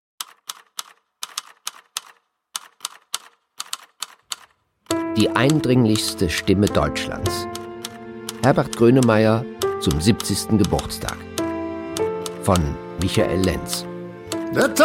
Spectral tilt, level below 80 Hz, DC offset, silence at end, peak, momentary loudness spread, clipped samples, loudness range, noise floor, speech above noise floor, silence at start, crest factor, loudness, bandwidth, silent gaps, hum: -5 dB/octave; -42 dBFS; under 0.1%; 0 s; -2 dBFS; 16 LU; under 0.1%; 13 LU; -54 dBFS; 36 dB; 0.2 s; 20 dB; -21 LUFS; 16.5 kHz; none; none